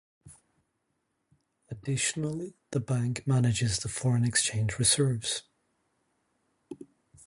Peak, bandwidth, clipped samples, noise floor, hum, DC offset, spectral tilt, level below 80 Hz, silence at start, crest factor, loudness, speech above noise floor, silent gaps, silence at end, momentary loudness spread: -10 dBFS; 11.5 kHz; under 0.1%; -79 dBFS; none; under 0.1%; -4 dB/octave; -56 dBFS; 0.25 s; 20 dB; -28 LUFS; 50 dB; none; 0.45 s; 20 LU